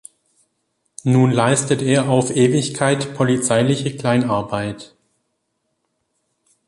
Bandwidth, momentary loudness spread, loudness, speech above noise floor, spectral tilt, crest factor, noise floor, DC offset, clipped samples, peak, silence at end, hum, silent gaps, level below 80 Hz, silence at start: 11.5 kHz; 9 LU; -18 LUFS; 55 dB; -5.5 dB/octave; 16 dB; -72 dBFS; under 0.1%; under 0.1%; -2 dBFS; 1.8 s; none; none; -54 dBFS; 1.05 s